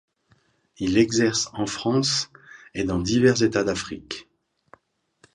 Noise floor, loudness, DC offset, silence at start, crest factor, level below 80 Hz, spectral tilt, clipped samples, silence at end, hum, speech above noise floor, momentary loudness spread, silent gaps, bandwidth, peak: -64 dBFS; -23 LUFS; under 0.1%; 0.8 s; 20 dB; -50 dBFS; -4.5 dB/octave; under 0.1%; 1.1 s; none; 42 dB; 16 LU; none; 10.5 kHz; -6 dBFS